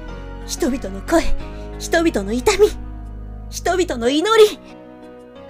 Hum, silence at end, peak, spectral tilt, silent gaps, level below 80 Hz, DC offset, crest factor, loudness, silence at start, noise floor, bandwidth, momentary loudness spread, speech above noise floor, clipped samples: none; 0 s; -4 dBFS; -4 dB/octave; none; -30 dBFS; under 0.1%; 16 dB; -18 LUFS; 0 s; -39 dBFS; 16 kHz; 21 LU; 22 dB; under 0.1%